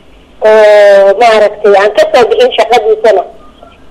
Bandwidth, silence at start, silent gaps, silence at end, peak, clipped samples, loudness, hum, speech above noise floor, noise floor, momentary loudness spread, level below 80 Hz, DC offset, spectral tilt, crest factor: 12.5 kHz; 0.4 s; none; 0.6 s; 0 dBFS; 2%; -6 LUFS; none; 29 dB; -34 dBFS; 6 LU; -44 dBFS; under 0.1%; -3 dB/octave; 6 dB